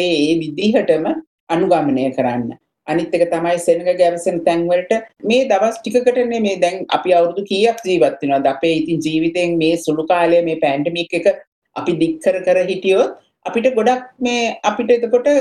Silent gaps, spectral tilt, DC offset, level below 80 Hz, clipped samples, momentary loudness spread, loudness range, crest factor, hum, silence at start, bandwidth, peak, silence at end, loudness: 1.27-1.47 s, 11.47-11.62 s; -5 dB/octave; under 0.1%; -56 dBFS; under 0.1%; 6 LU; 2 LU; 14 dB; none; 0 s; 12.5 kHz; -2 dBFS; 0 s; -17 LUFS